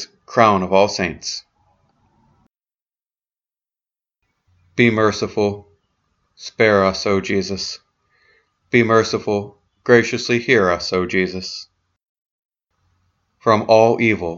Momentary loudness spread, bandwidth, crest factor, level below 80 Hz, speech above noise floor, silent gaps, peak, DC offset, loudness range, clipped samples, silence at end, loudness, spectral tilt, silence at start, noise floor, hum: 15 LU; 7.8 kHz; 20 dB; -54 dBFS; over 73 dB; 2.82-2.86 s, 3.06-3.10 s, 12.09-12.49 s; 0 dBFS; under 0.1%; 6 LU; under 0.1%; 0 s; -17 LUFS; -5 dB/octave; 0 s; under -90 dBFS; none